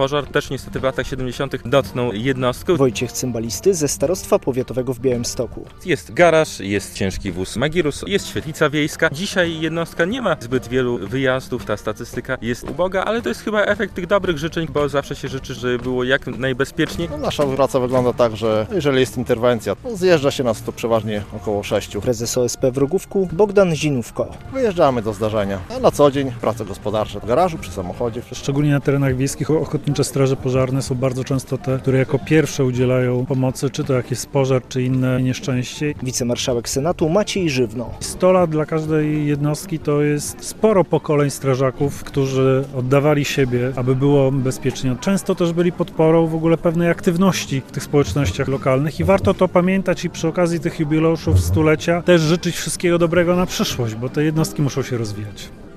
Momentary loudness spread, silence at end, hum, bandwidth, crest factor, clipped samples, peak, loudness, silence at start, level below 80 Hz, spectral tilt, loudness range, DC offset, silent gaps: 8 LU; 0 s; none; 14.5 kHz; 18 dB; under 0.1%; 0 dBFS; -19 LUFS; 0 s; -40 dBFS; -5.5 dB/octave; 3 LU; under 0.1%; none